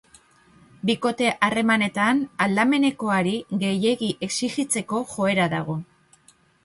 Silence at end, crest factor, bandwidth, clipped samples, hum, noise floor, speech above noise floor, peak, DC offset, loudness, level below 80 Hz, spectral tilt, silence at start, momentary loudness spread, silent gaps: 0.8 s; 20 dB; 11.5 kHz; under 0.1%; none; -58 dBFS; 35 dB; -4 dBFS; under 0.1%; -23 LUFS; -62 dBFS; -4.5 dB/octave; 0.85 s; 6 LU; none